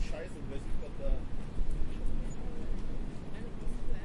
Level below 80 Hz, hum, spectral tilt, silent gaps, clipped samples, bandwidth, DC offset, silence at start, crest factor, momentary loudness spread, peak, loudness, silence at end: -34 dBFS; none; -7 dB/octave; none; under 0.1%; 7.4 kHz; under 0.1%; 0 s; 14 dB; 4 LU; -18 dBFS; -42 LUFS; 0 s